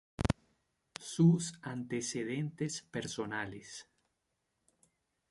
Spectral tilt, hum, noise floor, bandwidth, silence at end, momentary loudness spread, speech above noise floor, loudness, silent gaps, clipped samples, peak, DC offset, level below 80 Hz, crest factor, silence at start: -5.5 dB/octave; none; -83 dBFS; 11.5 kHz; 1.5 s; 20 LU; 49 dB; -35 LUFS; none; under 0.1%; -14 dBFS; under 0.1%; -56 dBFS; 22 dB; 0.2 s